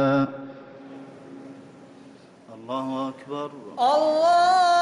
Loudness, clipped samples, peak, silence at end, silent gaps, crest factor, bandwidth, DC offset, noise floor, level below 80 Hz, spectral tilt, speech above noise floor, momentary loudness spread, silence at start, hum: -23 LUFS; under 0.1%; -12 dBFS; 0 s; none; 12 dB; 11 kHz; under 0.1%; -48 dBFS; -68 dBFS; -5 dB/octave; 27 dB; 25 LU; 0 s; none